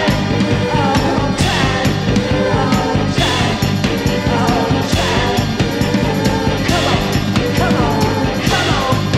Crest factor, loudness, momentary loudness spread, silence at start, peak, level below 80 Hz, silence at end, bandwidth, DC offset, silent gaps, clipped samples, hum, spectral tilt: 14 dB; -15 LUFS; 2 LU; 0 s; -2 dBFS; -28 dBFS; 0 s; 15.5 kHz; under 0.1%; none; under 0.1%; none; -5.5 dB/octave